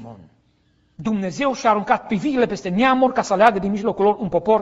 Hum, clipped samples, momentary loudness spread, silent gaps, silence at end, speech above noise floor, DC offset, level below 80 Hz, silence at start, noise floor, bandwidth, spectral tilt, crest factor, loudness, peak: none; under 0.1%; 7 LU; none; 0 s; 42 dB; under 0.1%; -52 dBFS; 0 s; -61 dBFS; 8 kHz; -6 dB/octave; 20 dB; -19 LUFS; 0 dBFS